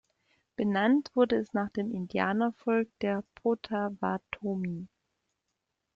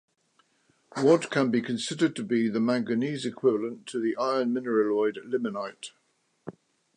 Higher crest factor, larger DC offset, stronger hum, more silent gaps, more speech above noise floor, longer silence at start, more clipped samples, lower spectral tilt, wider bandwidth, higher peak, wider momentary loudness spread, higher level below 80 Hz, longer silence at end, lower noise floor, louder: about the same, 20 dB vs 18 dB; neither; neither; neither; first, 54 dB vs 42 dB; second, 0.6 s vs 0.95 s; neither; first, -8 dB/octave vs -5.5 dB/octave; second, 7.2 kHz vs 11 kHz; second, -12 dBFS vs -8 dBFS; second, 9 LU vs 18 LU; first, -68 dBFS vs -78 dBFS; first, 1.1 s vs 0.45 s; first, -83 dBFS vs -69 dBFS; second, -30 LUFS vs -27 LUFS